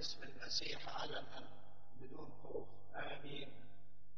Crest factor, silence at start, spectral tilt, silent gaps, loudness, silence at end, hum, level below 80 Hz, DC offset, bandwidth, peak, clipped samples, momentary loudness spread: 24 dB; 0 s; -1.5 dB/octave; none; -48 LUFS; 0 s; 50 Hz at -70 dBFS; -74 dBFS; 0.9%; 7.4 kHz; -26 dBFS; under 0.1%; 20 LU